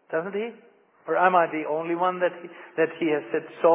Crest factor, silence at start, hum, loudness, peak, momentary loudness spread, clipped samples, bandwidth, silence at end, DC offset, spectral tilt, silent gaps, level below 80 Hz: 20 dB; 0.1 s; none; -25 LUFS; -6 dBFS; 15 LU; under 0.1%; 3.8 kHz; 0 s; under 0.1%; -9.5 dB/octave; none; -86 dBFS